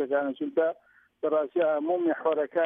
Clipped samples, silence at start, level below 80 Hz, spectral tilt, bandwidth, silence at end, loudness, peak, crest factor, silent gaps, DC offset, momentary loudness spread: under 0.1%; 0 s; -84 dBFS; -8.5 dB/octave; 3.8 kHz; 0 s; -28 LUFS; -14 dBFS; 14 dB; none; under 0.1%; 4 LU